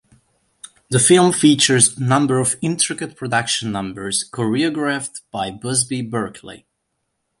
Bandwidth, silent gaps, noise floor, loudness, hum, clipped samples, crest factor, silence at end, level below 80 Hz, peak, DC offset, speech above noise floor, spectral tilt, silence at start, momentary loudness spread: 11.5 kHz; none; -73 dBFS; -17 LUFS; none; under 0.1%; 20 dB; 0.85 s; -56 dBFS; 0 dBFS; under 0.1%; 55 dB; -3.5 dB/octave; 0.65 s; 14 LU